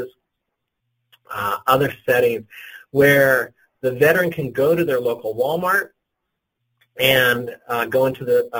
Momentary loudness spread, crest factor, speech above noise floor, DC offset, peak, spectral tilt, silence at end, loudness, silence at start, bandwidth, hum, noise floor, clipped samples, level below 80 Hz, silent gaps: 13 LU; 18 dB; 60 dB; under 0.1%; -2 dBFS; -5 dB/octave; 0 s; -18 LUFS; 0 s; 17 kHz; none; -78 dBFS; under 0.1%; -56 dBFS; none